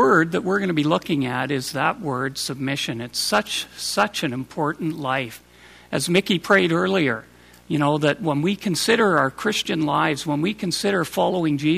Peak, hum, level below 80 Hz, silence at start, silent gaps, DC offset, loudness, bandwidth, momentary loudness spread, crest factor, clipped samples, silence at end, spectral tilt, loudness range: -4 dBFS; none; -58 dBFS; 0 s; none; under 0.1%; -22 LUFS; 15.5 kHz; 8 LU; 18 dB; under 0.1%; 0 s; -4.5 dB/octave; 4 LU